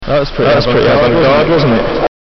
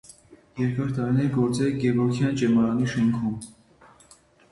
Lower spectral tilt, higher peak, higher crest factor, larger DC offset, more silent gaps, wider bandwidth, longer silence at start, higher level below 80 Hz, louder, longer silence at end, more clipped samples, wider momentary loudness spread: second, -4.5 dB/octave vs -7.5 dB/octave; first, -4 dBFS vs -12 dBFS; second, 6 dB vs 14 dB; neither; neither; second, 6.2 kHz vs 11.5 kHz; second, 0 s vs 0.3 s; first, -26 dBFS vs -54 dBFS; first, -10 LUFS vs -24 LUFS; second, 0.25 s vs 1 s; neither; second, 6 LU vs 9 LU